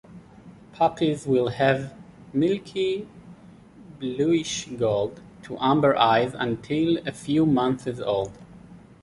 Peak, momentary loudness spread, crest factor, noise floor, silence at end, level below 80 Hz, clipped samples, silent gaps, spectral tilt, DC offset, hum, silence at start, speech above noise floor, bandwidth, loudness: -6 dBFS; 12 LU; 18 dB; -48 dBFS; 0.25 s; -56 dBFS; under 0.1%; none; -5.5 dB/octave; under 0.1%; none; 0.1 s; 25 dB; 11.5 kHz; -24 LUFS